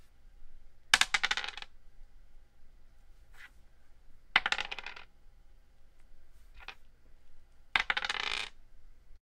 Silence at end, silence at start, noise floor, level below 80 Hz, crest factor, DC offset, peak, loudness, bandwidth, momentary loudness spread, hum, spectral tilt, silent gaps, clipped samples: 0.05 s; 0 s; -56 dBFS; -56 dBFS; 34 dB; under 0.1%; -4 dBFS; -31 LUFS; 16 kHz; 25 LU; 60 Hz at -80 dBFS; 1 dB/octave; none; under 0.1%